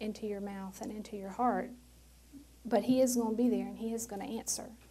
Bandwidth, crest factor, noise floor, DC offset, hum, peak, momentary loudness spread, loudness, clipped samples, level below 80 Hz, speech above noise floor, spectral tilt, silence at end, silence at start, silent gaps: 16 kHz; 18 dB; -58 dBFS; under 0.1%; none; -16 dBFS; 14 LU; -34 LUFS; under 0.1%; -62 dBFS; 23 dB; -4.5 dB/octave; 0.05 s; 0 s; none